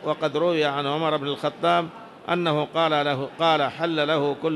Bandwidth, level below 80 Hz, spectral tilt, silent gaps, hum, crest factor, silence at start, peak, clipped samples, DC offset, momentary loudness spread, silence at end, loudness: 12 kHz; -70 dBFS; -6 dB/octave; none; none; 14 dB; 0 s; -8 dBFS; under 0.1%; under 0.1%; 5 LU; 0 s; -23 LUFS